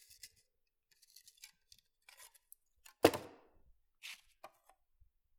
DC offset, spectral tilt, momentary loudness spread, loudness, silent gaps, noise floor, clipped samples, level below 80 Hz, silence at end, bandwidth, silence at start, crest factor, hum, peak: under 0.1%; -4 dB/octave; 28 LU; -36 LUFS; none; -82 dBFS; under 0.1%; -76 dBFS; 1.25 s; 19.5 kHz; 3.05 s; 36 dB; none; -8 dBFS